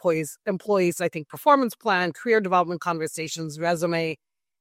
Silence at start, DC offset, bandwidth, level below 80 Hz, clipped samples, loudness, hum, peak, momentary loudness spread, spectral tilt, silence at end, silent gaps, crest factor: 0.05 s; under 0.1%; 16 kHz; -72 dBFS; under 0.1%; -24 LUFS; none; -4 dBFS; 10 LU; -5 dB/octave; 0.45 s; none; 20 dB